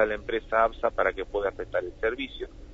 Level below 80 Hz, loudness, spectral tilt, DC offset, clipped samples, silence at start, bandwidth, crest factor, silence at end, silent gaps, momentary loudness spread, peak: -46 dBFS; -28 LUFS; -6 dB/octave; under 0.1%; under 0.1%; 0 s; 7.8 kHz; 20 dB; 0 s; none; 9 LU; -8 dBFS